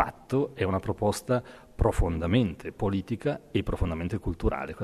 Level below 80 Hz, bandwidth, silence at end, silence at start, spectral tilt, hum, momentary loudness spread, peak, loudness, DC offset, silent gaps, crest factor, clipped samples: -36 dBFS; 13.5 kHz; 0 s; 0 s; -7 dB/octave; none; 5 LU; -6 dBFS; -29 LUFS; under 0.1%; none; 22 dB; under 0.1%